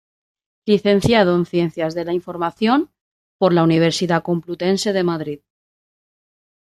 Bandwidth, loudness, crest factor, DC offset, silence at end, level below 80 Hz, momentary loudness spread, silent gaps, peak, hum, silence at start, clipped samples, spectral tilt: 13 kHz; -18 LUFS; 18 dB; under 0.1%; 1.35 s; -52 dBFS; 11 LU; 3.01-3.39 s; -2 dBFS; none; 0.65 s; under 0.1%; -6 dB/octave